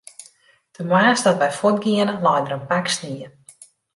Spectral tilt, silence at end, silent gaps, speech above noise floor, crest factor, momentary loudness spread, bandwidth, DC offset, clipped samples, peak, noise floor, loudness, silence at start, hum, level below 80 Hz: -4.5 dB/octave; 0.65 s; none; 36 dB; 18 dB; 17 LU; 11.5 kHz; under 0.1%; under 0.1%; -4 dBFS; -55 dBFS; -19 LUFS; 0.2 s; none; -66 dBFS